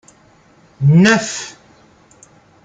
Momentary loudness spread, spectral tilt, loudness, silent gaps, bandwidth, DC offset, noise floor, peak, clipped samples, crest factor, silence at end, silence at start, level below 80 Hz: 17 LU; -5.5 dB/octave; -13 LUFS; none; 9.2 kHz; under 0.1%; -50 dBFS; 0 dBFS; under 0.1%; 16 dB; 1.15 s; 0.8 s; -56 dBFS